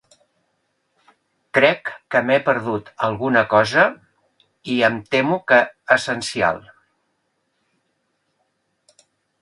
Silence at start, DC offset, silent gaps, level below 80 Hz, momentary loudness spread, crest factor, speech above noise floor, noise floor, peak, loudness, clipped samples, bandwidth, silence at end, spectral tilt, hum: 1.55 s; under 0.1%; none; -60 dBFS; 9 LU; 20 dB; 52 dB; -70 dBFS; 0 dBFS; -18 LUFS; under 0.1%; 11.5 kHz; 2.8 s; -4.5 dB/octave; none